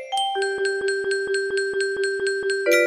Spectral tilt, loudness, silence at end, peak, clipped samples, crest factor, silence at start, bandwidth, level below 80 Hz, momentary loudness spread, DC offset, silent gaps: -1 dB/octave; -23 LUFS; 0 s; -6 dBFS; under 0.1%; 18 dB; 0 s; 13 kHz; -64 dBFS; 1 LU; under 0.1%; none